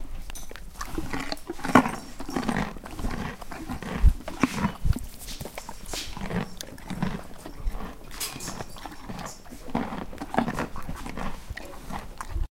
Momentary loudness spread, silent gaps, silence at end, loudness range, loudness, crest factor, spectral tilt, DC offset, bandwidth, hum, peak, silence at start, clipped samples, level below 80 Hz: 14 LU; none; 0.05 s; 8 LU; -31 LUFS; 26 dB; -5 dB/octave; 0.2%; 16.5 kHz; none; -2 dBFS; 0 s; under 0.1%; -34 dBFS